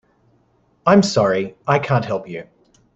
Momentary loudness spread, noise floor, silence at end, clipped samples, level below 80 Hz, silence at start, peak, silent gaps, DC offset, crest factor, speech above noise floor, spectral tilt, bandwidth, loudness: 14 LU; -60 dBFS; 0.5 s; under 0.1%; -56 dBFS; 0.85 s; -2 dBFS; none; under 0.1%; 18 dB; 43 dB; -6 dB/octave; 8.2 kHz; -18 LUFS